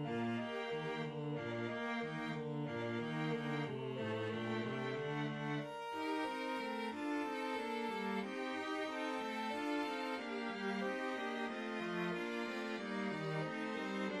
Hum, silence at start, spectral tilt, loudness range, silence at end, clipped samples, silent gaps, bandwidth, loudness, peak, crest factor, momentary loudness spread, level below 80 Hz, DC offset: none; 0 s; -6 dB/octave; 1 LU; 0 s; under 0.1%; none; 13.5 kHz; -41 LUFS; -28 dBFS; 14 dB; 2 LU; -80 dBFS; under 0.1%